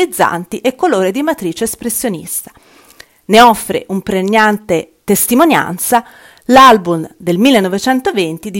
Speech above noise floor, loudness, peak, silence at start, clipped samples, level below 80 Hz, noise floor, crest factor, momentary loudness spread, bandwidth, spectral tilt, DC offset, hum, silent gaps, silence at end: 30 dB; -12 LUFS; 0 dBFS; 0 s; 2%; -46 dBFS; -42 dBFS; 12 dB; 11 LU; over 20 kHz; -4 dB/octave; under 0.1%; none; none; 0 s